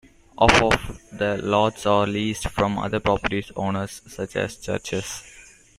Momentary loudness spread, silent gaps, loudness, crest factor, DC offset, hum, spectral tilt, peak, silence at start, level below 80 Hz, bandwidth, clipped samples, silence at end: 12 LU; none; -23 LUFS; 24 dB; under 0.1%; none; -4.5 dB/octave; 0 dBFS; 0.4 s; -42 dBFS; 15.5 kHz; under 0.1%; 0.35 s